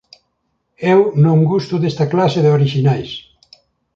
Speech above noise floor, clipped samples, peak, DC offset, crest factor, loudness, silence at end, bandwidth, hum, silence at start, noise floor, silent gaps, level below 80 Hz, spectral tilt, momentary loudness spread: 55 dB; under 0.1%; -2 dBFS; under 0.1%; 14 dB; -15 LUFS; 0.75 s; 7.4 kHz; none; 0.8 s; -68 dBFS; none; -54 dBFS; -8 dB/octave; 9 LU